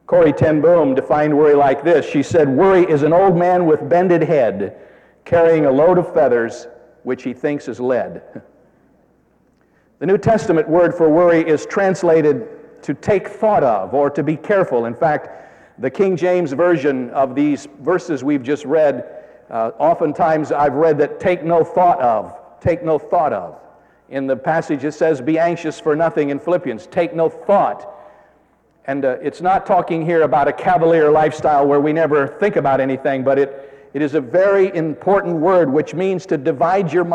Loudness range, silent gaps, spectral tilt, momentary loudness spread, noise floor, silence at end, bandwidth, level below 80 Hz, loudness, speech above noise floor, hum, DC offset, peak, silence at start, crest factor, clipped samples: 6 LU; none; -7.5 dB/octave; 10 LU; -57 dBFS; 0 s; 9 kHz; -52 dBFS; -16 LUFS; 41 dB; none; under 0.1%; -4 dBFS; 0.1 s; 12 dB; under 0.1%